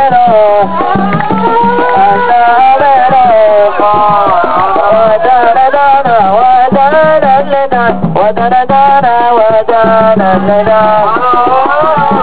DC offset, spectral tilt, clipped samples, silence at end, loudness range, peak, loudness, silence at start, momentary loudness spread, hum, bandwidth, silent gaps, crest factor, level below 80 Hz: 10%; -9.5 dB/octave; 2%; 0 s; 1 LU; 0 dBFS; -7 LUFS; 0 s; 4 LU; none; 4 kHz; none; 8 dB; -40 dBFS